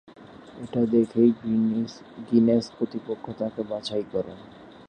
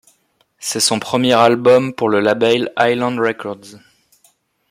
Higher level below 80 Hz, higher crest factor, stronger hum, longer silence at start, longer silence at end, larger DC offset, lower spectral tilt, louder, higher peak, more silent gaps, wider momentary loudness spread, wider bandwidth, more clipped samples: about the same, -62 dBFS vs -62 dBFS; about the same, 18 dB vs 16 dB; neither; second, 0.2 s vs 0.6 s; second, 0.2 s vs 0.95 s; neither; first, -7.5 dB/octave vs -3.5 dB/octave; second, -25 LUFS vs -15 LUFS; second, -8 dBFS vs 0 dBFS; neither; first, 17 LU vs 14 LU; second, 9 kHz vs 16 kHz; neither